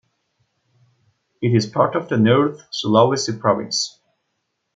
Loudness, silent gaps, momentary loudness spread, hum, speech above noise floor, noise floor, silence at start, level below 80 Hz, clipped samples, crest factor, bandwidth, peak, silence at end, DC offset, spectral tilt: -19 LUFS; none; 8 LU; none; 56 dB; -74 dBFS; 1.4 s; -64 dBFS; under 0.1%; 18 dB; 9.2 kHz; -2 dBFS; 0.85 s; under 0.1%; -5 dB/octave